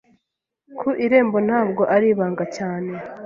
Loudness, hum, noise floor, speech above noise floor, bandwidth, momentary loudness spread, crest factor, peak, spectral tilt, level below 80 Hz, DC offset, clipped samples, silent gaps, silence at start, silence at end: -20 LUFS; none; -79 dBFS; 60 dB; 7.6 kHz; 11 LU; 18 dB; -4 dBFS; -7.5 dB/octave; -64 dBFS; under 0.1%; under 0.1%; none; 0.7 s; 0 s